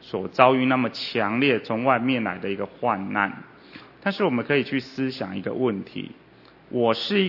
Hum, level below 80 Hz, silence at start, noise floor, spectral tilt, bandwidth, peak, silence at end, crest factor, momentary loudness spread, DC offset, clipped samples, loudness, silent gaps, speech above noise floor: none; -68 dBFS; 0.05 s; -46 dBFS; -7 dB/octave; 6 kHz; 0 dBFS; 0 s; 24 dB; 12 LU; under 0.1%; under 0.1%; -24 LUFS; none; 23 dB